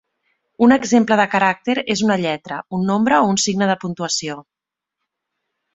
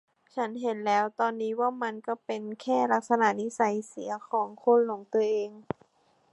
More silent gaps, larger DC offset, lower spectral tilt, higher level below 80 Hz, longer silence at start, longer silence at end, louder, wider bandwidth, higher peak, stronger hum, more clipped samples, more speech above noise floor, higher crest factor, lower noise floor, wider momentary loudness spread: neither; neither; about the same, -4 dB/octave vs -5 dB/octave; first, -58 dBFS vs -76 dBFS; first, 0.6 s vs 0.35 s; first, 1.35 s vs 0.7 s; first, -17 LUFS vs -28 LUFS; second, 8.2 kHz vs 11.5 kHz; first, -2 dBFS vs -10 dBFS; neither; neither; first, 66 dB vs 39 dB; about the same, 18 dB vs 18 dB; first, -83 dBFS vs -67 dBFS; second, 9 LU vs 12 LU